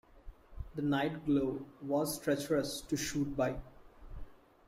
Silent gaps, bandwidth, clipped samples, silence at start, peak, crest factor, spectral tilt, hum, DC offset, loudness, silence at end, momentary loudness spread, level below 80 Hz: none; 16 kHz; under 0.1%; 0.15 s; -20 dBFS; 16 dB; -5 dB/octave; none; under 0.1%; -35 LUFS; 0.3 s; 20 LU; -54 dBFS